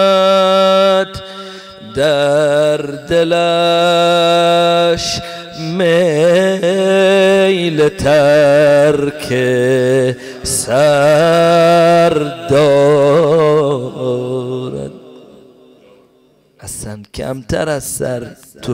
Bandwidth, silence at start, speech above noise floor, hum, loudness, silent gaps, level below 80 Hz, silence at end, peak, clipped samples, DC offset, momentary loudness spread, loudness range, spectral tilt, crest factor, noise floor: 16 kHz; 0 s; 40 dB; none; -12 LUFS; none; -44 dBFS; 0 s; -4 dBFS; under 0.1%; under 0.1%; 16 LU; 12 LU; -5 dB/octave; 8 dB; -51 dBFS